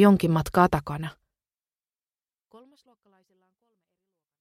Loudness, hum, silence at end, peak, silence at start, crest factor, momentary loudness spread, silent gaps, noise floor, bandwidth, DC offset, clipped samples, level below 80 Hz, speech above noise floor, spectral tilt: -23 LUFS; none; 3.3 s; -4 dBFS; 0 s; 22 dB; 15 LU; none; under -90 dBFS; 15.5 kHz; under 0.1%; under 0.1%; -50 dBFS; over 69 dB; -7.5 dB/octave